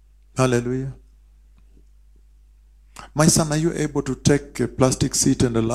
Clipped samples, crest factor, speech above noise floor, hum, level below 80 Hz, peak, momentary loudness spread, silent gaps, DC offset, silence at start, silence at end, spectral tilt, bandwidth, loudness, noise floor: under 0.1%; 20 dB; 31 dB; 50 Hz at -40 dBFS; -42 dBFS; -2 dBFS; 11 LU; none; 0.1%; 0.35 s; 0 s; -5 dB/octave; 15.5 kHz; -20 LUFS; -51 dBFS